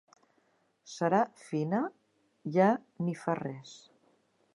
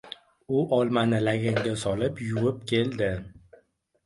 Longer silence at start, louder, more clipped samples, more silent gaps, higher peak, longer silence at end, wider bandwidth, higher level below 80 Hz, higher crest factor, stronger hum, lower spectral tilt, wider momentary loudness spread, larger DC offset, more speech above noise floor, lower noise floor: first, 0.85 s vs 0.05 s; second, -31 LUFS vs -26 LUFS; neither; neither; about the same, -12 dBFS vs -10 dBFS; first, 0.8 s vs 0.65 s; about the same, 11.5 kHz vs 11.5 kHz; second, -82 dBFS vs -54 dBFS; about the same, 20 dB vs 18 dB; neither; about the same, -7 dB/octave vs -6.5 dB/octave; first, 18 LU vs 6 LU; neither; about the same, 41 dB vs 38 dB; first, -72 dBFS vs -64 dBFS